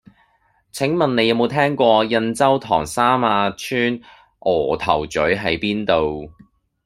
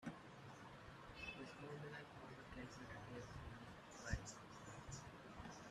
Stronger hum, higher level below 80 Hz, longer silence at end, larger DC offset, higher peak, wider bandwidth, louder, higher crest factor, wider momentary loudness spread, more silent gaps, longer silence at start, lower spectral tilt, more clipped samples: neither; first, -48 dBFS vs -64 dBFS; first, 0.55 s vs 0 s; neither; first, -2 dBFS vs -30 dBFS; first, 15.5 kHz vs 13.5 kHz; first, -18 LUFS vs -55 LUFS; second, 18 dB vs 26 dB; about the same, 7 LU vs 9 LU; neither; first, 0.75 s vs 0 s; about the same, -5 dB/octave vs -4.5 dB/octave; neither